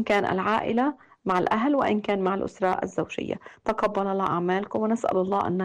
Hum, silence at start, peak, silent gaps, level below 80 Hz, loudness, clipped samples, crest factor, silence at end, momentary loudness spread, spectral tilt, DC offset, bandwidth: none; 0 s; -12 dBFS; none; -58 dBFS; -26 LUFS; under 0.1%; 12 dB; 0 s; 7 LU; -6.5 dB/octave; under 0.1%; 11 kHz